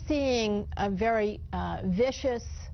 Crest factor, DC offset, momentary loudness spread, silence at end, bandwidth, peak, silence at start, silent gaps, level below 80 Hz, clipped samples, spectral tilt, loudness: 14 dB; under 0.1%; 7 LU; 0 s; 6.6 kHz; -16 dBFS; 0 s; none; -42 dBFS; under 0.1%; -6 dB/octave; -29 LUFS